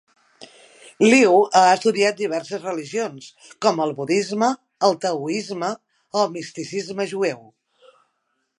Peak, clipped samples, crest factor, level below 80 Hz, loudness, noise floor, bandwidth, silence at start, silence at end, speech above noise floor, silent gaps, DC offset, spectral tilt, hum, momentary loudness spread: -2 dBFS; under 0.1%; 20 dB; -76 dBFS; -20 LUFS; -73 dBFS; 11.5 kHz; 0.4 s; 1.2 s; 53 dB; none; under 0.1%; -4 dB/octave; none; 14 LU